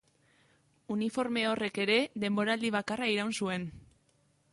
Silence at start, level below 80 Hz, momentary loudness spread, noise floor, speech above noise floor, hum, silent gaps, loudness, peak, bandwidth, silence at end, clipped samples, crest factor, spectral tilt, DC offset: 0.9 s; -68 dBFS; 7 LU; -70 dBFS; 39 dB; none; none; -31 LUFS; -16 dBFS; 11.5 kHz; 0.75 s; under 0.1%; 18 dB; -4.5 dB/octave; under 0.1%